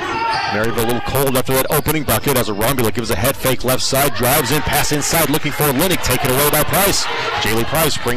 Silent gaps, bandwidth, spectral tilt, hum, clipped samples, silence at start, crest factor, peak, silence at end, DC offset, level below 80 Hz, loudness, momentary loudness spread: none; 16 kHz; -3.5 dB/octave; none; under 0.1%; 0 s; 10 dB; -4 dBFS; 0 s; 5%; -34 dBFS; -16 LUFS; 4 LU